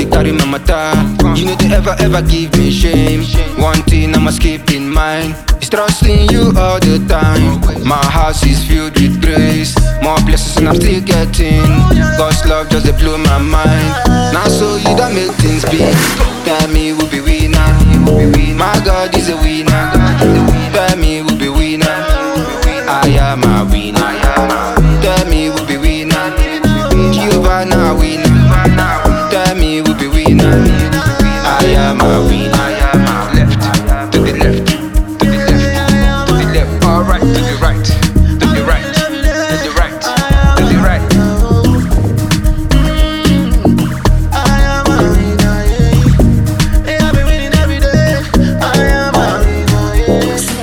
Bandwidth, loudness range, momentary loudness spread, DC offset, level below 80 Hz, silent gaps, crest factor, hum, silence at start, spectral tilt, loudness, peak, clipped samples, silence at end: 18 kHz; 2 LU; 4 LU; under 0.1%; -14 dBFS; none; 10 dB; none; 0 s; -5.5 dB/octave; -11 LUFS; 0 dBFS; under 0.1%; 0 s